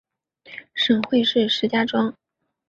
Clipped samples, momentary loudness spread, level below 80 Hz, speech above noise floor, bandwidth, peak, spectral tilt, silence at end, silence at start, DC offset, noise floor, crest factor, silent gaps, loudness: under 0.1%; 16 LU; -66 dBFS; 29 dB; 7.6 kHz; -4 dBFS; -5 dB/octave; 0.6 s; 0.5 s; under 0.1%; -49 dBFS; 18 dB; none; -20 LUFS